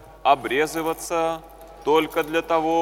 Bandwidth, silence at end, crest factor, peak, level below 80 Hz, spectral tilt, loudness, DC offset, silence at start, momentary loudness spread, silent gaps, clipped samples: 17.5 kHz; 0 s; 18 dB; -4 dBFS; -52 dBFS; -3.5 dB/octave; -23 LUFS; under 0.1%; 0 s; 7 LU; none; under 0.1%